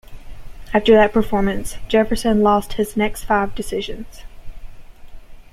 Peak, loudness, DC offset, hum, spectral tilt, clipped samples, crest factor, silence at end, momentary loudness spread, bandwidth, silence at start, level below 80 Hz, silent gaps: -2 dBFS; -18 LUFS; under 0.1%; none; -5.5 dB/octave; under 0.1%; 18 dB; 0.1 s; 14 LU; 15 kHz; 0.05 s; -34 dBFS; none